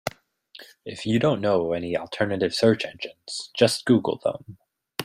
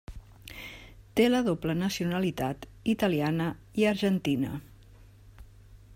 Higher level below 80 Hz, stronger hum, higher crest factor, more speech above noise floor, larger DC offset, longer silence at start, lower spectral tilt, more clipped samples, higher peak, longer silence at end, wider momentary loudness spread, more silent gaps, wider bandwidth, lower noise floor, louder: second, -60 dBFS vs -52 dBFS; neither; about the same, 20 dB vs 18 dB; about the same, 28 dB vs 25 dB; neither; about the same, 0.05 s vs 0.1 s; about the same, -5 dB/octave vs -6 dB/octave; neither; first, -4 dBFS vs -12 dBFS; about the same, 0 s vs 0 s; second, 14 LU vs 18 LU; neither; about the same, 16 kHz vs 16 kHz; about the same, -52 dBFS vs -53 dBFS; first, -24 LUFS vs -28 LUFS